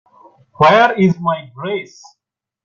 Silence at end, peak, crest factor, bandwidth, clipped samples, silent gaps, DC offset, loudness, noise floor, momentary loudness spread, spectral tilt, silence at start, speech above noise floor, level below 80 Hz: 0.8 s; 0 dBFS; 16 dB; 7.2 kHz; under 0.1%; none; under 0.1%; -14 LUFS; -48 dBFS; 13 LU; -6.5 dB/octave; 0.6 s; 33 dB; -54 dBFS